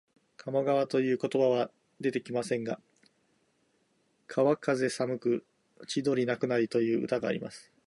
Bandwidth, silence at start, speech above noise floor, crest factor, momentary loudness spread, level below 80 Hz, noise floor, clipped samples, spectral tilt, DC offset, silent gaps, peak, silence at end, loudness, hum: 11.5 kHz; 0.45 s; 43 dB; 18 dB; 9 LU; -76 dBFS; -72 dBFS; under 0.1%; -6 dB/octave; under 0.1%; none; -14 dBFS; 0.25 s; -30 LUFS; none